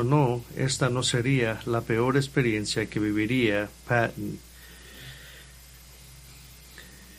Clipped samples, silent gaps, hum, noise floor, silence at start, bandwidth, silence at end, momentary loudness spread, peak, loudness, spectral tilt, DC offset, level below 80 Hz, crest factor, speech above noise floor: under 0.1%; none; none; -49 dBFS; 0 s; 15.5 kHz; 0 s; 23 LU; -8 dBFS; -26 LUFS; -5 dB/octave; under 0.1%; -50 dBFS; 20 dB; 23 dB